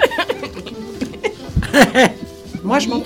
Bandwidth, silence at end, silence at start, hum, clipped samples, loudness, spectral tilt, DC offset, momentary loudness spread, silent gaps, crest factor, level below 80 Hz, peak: 19.5 kHz; 0 s; 0 s; none; under 0.1%; -17 LUFS; -4.5 dB/octave; under 0.1%; 18 LU; none; 18 dB; -34 dBFS; 0 dBFS